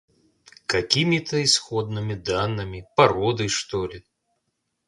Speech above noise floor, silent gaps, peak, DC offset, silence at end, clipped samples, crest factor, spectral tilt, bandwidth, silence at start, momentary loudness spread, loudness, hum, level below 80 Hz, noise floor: 53 dB; none; -2 dBFS; under 0.1%; 0.85 s; under 0.1%; 24 dB; -4 dB/octave; 11.5 kHz; 0.7 s; 10 LU; -22 LUFS; none; -50 dBFS; -76 dBFS